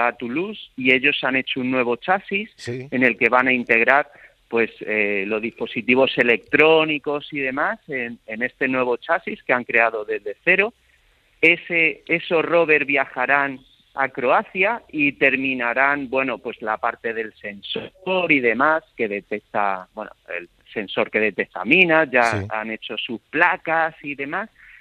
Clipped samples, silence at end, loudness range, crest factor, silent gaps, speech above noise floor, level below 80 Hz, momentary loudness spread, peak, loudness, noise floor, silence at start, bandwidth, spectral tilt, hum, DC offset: under 0.1%; 0.35 s; 3 LU; 20 dB; none; 38 dB; -64 dBFS; 13 LU; 0 dBFS; -20 LUFS; -59 dBFS; 0 s; 11 kHz; -5.5 dB/octave; none; under 0.1%